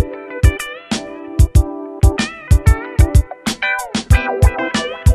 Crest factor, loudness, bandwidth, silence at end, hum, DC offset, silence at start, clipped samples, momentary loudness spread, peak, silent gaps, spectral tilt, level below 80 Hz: 14 dB; -16 LUFS; 13 kHz; 0 s; none; under 0.1%; 0 s; under 0.1%; 10 LU; 0 dBFS; none; -5.5 dB/octave; -18 dBFS